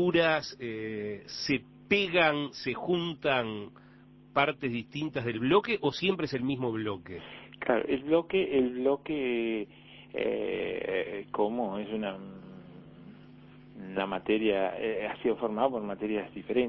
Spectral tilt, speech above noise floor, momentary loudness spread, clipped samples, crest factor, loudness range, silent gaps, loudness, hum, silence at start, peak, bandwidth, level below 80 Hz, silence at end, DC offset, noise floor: -6 dB/octave; 25 dB; 16 LU; under 0.1%; 22 dB; 5 LU; none; -30 LUFS; none; 0 s; -10 dBFS; 6.2 kHz; -62 dBFS; 0 s; under 0.1%; -55 dBFS